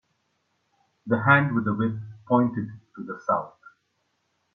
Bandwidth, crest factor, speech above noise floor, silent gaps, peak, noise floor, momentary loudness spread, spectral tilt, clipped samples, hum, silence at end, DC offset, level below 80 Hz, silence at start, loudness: 6.4 kHz; 24 dB; 50 dB; none; -4 dBFS; -73 dBFS; 19 LU; -9 dB/octave; under 0.1%; none; 1.05 s; under 0.1%; -64 dBFS; 1.05 s; -24 LUFS